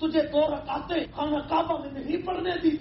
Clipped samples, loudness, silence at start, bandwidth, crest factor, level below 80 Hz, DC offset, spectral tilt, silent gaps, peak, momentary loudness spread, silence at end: under 0.1%; -28 LUFS; 0 s; 5.8 kHz; 16 dB; -50 dBFS; under 0.1%; -4 dB/octave; none; -12 dBFS; 6 LU; 0 s